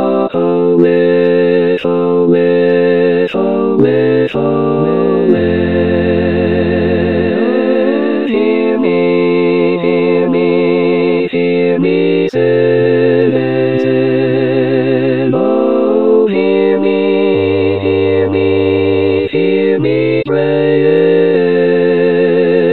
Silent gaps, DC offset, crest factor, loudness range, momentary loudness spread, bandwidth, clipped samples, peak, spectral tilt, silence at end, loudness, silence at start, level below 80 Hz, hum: none; 1%; 10 dB; 1 LU; 3 LU; 4.4 kHz; under 0.1%; 0 dBFS; -9.5 dB/octave; 0 s; -11 LUFS; 0 s; -44 dBFS; none